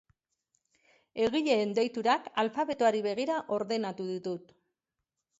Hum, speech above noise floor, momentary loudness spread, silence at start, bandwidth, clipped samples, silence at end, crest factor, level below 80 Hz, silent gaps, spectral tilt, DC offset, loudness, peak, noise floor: none; 57 dB; 9 LU; 1.15 s; 8 kHz; under 0.1%; 1 s; 18 dB; -72 dBFS; none; -5 dB/octave; under 0.1%; -30 LUFS; -14 dBFS; -87 dBFS